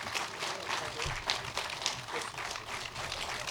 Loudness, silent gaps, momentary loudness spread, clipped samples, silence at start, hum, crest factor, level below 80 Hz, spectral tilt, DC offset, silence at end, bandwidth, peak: -36 LUFS; none; 4 LU; under 0.1%; 0 s; none; 30 dB; -54 dBFS; -1.5 dB/octave; under 0.1%; 0 s; over 20 kHz; -8 dBFS